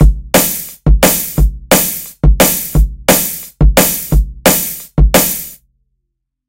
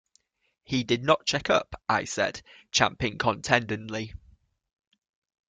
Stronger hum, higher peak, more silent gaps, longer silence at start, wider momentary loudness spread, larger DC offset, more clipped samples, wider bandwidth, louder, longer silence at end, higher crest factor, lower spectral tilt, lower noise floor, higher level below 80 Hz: neither; first, 0 dBFS vs -4 dBFS; neither; second, 0 s vs 0.7 s; second, 7 LU vs 10 LU; first, 0.2% vs under 0.1%; first, 0.3% vs under 0.1%; first, 17.5 kHz vs 9.6 kHz; first, -12 LUFS vs -26 LUFS; second, 0.95 s vs 1.35 s; second, 12 dB vs 26 dB; about the same, -4 dB/octave vs -3.5 dB/octave; about the same, -71 dBFS vs -69 dBFS; first, -14 dBFS vs -56 dBFS